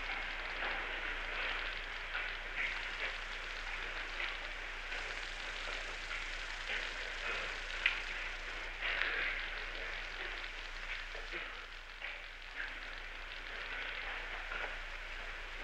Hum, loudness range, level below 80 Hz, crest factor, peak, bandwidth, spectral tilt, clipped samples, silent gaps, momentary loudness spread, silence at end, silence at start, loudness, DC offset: none; 6 LU; -50 dBFS; 28 dB; -14 dBFS; 12 kHz; -1.5 dB/octave; under 0.1%; none; 8 LU; 0 s; 0 s; -40 LUFS; under 0.1%